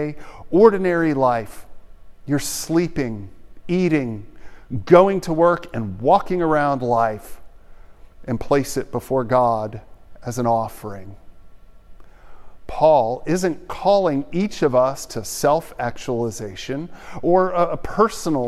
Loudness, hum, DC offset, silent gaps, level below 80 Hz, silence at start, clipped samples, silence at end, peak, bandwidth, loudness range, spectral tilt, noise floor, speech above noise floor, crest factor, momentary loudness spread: -20 LUFS; none; under 0.1%; none; -44 dBFS; 0 s; under 0.1%; 0 s; 0 dBFS; 15 kHz; 6 LU; -6 dB/octave; -41 dBFS; 22 dB; 20 dB; 16 LU